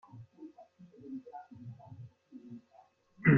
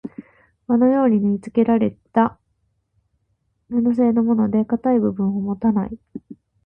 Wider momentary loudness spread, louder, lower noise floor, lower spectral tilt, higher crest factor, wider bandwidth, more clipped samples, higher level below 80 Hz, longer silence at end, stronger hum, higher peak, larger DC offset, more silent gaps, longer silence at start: about the same, 12 LU vs 10 LU; second, -44 LUFS vs -19 LUFS; second, -64 dBFS vs -69 dBFS; second, -9 dB/octave vs -10.5 dB/octave; first, 24 dB vs 16 dB; about the same, 3.1 kHz vs 3.3 kHz; neither; second, -68 dBFS vs -54 dBFS; second, 0 s vs 0.3 s; neither; second, -12 dBFS vs -4 dBFS; neither; neither; first, 0.2 s vs 0.05 s